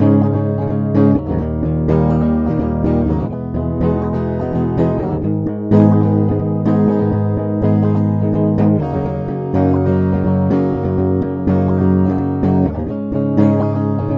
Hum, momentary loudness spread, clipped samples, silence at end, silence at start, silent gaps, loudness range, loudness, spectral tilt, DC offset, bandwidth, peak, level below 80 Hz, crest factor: none; 6 LU; under 0.1%; 0 s; 0 s; none; 2 LU; -16 LUFS; -11.5 dB/octave; under 0.1%; 5.4 kHz; -2 dBFS; -32 dBFS; 14 dB